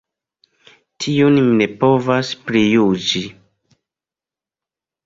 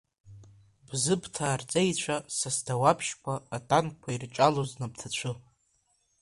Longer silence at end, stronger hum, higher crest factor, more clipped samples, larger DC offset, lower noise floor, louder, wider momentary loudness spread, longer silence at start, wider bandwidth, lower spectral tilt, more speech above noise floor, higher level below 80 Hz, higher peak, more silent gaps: first, 1.75 s vs 0.8 s; neither; second, 16 dB vs 22 dB; neither; neither; first, -89 dBFS vs -72 dBFS; first, -16 LUFS vs -29 LUFS; about the same, 9 LU vs 11 LU; first, 1 s vs 0.25 s; second, 7.8 kHz vs 11.5 kHz; first, -5.5 dB/octave vs -4 dB/octave; first, 74 dB vs 43 dB; first, -56 dBFS vs -62 dBFS; first, -2 dBFS vs -8 dBFS; neither